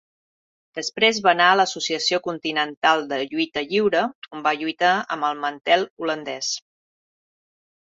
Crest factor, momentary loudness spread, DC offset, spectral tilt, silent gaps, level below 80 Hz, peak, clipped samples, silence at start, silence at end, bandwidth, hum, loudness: 20 dB; 10 LU; under 0.1%; -2.5 dB/octave; 2.77-2.82 s, 4.15-4.22 s, 5.90-5.97 s; -70 dBFS; -2 dBFS; under 0.1%; 0.75 s; 1.25 s; 7.8 kHz; none; -21 LUFS